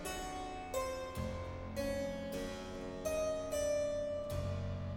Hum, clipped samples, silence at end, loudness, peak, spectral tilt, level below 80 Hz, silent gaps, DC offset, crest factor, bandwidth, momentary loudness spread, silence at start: none; under 0.1%; 0 s; -40 LUFS; -26 dBFS; -5 dB/octave; -52 dBFS; none; under 0.1%; 14 dB; 16.5 kHz; 7 LU; 0 s